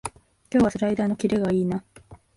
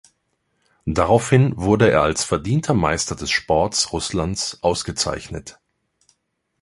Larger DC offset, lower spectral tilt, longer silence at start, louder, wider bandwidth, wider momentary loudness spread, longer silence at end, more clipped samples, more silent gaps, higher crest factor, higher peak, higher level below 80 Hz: neither; first, -7 dB/octave vs -4.5 dB/octave; second, 0.05 s vs 0.85 s; second, -24 LUFS vs -19 LUFS; about the same, 11.5 kHz vs 11.5 kHz; about the same, 8 LU vs 9 LU; second, 0.2 s vs 1.1 s; neither; neither; about the same, 16 dB vs 18 dB; second, -10 dBFS vs -2 dBFS; second, -50 dBFS vs -40 dBFS